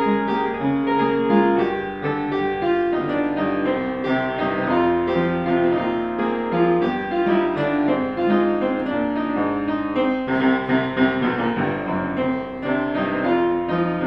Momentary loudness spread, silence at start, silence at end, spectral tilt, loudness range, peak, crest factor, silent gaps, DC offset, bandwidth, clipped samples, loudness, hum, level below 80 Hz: 4 LU; 0 s; 0 s; -9 dB/octave; 1 LU; -6 dBFS; 16 dB; none; 0.1%; 5.8 kHz; under 0.1%; -21 LUFS; none; -50 dBFS